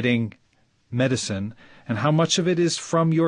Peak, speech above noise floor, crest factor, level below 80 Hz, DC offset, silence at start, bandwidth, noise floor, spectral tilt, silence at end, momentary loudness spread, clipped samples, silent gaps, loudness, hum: -8 dBFS; 39 dB; 16 dB; -56 dBFS; under 0.1%; 0 s; 10.5 kHz; -61 dBFS; -5 dB/octave; 0 s; 12 LU; under 0.1%; none; -23 LUFS; none